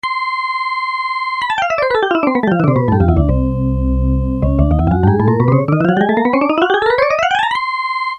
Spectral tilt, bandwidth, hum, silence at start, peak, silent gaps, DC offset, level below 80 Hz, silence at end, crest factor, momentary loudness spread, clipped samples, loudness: -8 dB/octave; 9.4 kHz; none; 0.05 s; 0 dBFS; none; under 0.1%; -24 dBFS; 0 s; 14 dB; 5 LU; under 0.1%; -15 LUFS